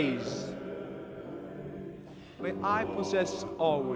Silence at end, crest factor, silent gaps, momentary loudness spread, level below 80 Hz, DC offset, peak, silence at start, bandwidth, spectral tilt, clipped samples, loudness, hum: 0 s; 18 dB; none; 13 LU; -62 dBFS; under 0.1%; -16 dBFS; 0 s; 9.6 kHz; -5.5 dB/octave; under 0.1%; -34 LUFS; none